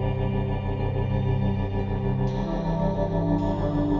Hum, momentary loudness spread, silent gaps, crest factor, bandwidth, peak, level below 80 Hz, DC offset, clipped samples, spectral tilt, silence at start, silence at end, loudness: none; 3 LU; none; 14 dB; 7 kHz; -12 dBFS; -32 dBFS; under 0.1%; under 0.1%; -9.5 dB/octave; 0 s; 0 s; -26 LUFS